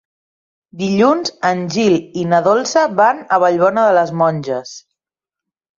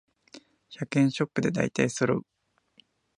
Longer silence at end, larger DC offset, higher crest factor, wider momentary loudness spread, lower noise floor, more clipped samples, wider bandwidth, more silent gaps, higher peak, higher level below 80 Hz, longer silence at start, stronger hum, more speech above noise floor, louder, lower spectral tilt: about the same, 1 s vs 1 s; neither; second, 14 dB vs 22 dB; first, 9 LU vs 6 LU; first, -87 dBFS vs -64 dBFS; neither; second, 7.6 kHz vs 11 kHz; neither; first, -2 dBFS vs -8 dBFS; about the same, -60 dBFS vs -64 dBFS; first, 0.75 s vs 0.35 s; neither; first, 73 dB vs 37 dB; first, -15 LUFS vs -27 LUFS; about the same, -5.5 dB/octave vs -6 dB/octave